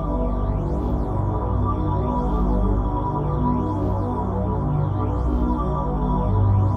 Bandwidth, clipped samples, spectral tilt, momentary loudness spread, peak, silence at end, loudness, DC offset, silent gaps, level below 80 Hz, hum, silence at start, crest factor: 3.8 kHz; under 0.1%; -11 dB/octave; 3 LU; -8 dBFS; 0 s; -23 LUFS; under 0.1%; none; -26 dBFS; 50 Hz at -35 dBFS; 0 s; 12 dB